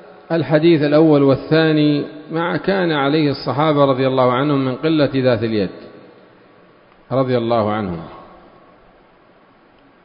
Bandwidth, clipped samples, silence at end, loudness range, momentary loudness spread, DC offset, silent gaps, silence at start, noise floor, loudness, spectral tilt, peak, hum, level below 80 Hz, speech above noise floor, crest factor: 5.4 kHz; under 0.1%; 1.8 s; 8 LU; 10 LU; under 0.1%; none; 0.3 s; -50 dBFS; -16 LUFS; -12 dB/octave; 0 dBFS; none; -52 dBFS; 35 dB; 18 dB